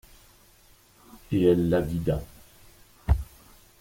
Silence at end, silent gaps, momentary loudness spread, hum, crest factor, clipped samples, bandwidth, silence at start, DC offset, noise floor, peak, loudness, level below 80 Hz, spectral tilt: 0.55 s; none; 18 LU; none; 20 dB; under 0.1%; 16.5 kHz; 1.15 s; under 0.1%; -57 dBFS; -8 dBFS; -26 LUFS; -36 dBFS; -8 dB/octave